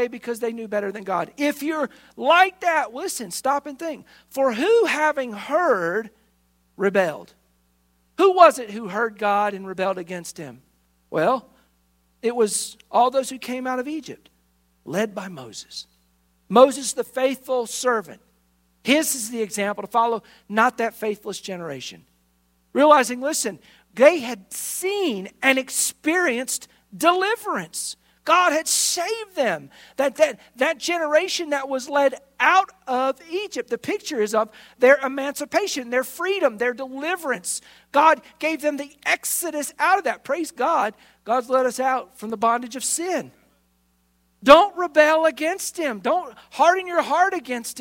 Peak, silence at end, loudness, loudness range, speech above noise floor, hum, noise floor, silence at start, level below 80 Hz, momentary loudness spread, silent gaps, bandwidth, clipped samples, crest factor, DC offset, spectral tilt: 0 dBFS; 0 s; -21 LUFS; 5 LU; 43 dB; none; -65 dBFS; 0 s; -64 dBFS; 14 LU; none; 16.5 kHz; under 0.1%; 22 dB; under 0.1%; -2.5 dB/octave